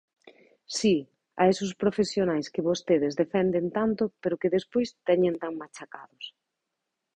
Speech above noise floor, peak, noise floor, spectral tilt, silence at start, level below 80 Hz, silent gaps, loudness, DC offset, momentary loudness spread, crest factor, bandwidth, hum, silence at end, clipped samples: 57 dB; -10 dBFS; -84 dBFS; -5.5 dB/octave; 0.7 s; -64 dBFS; none; -27 LUFS; under 0.1%; 18 LU; 18 dB; 10 kHz; none; 0.85 s; under 0.1%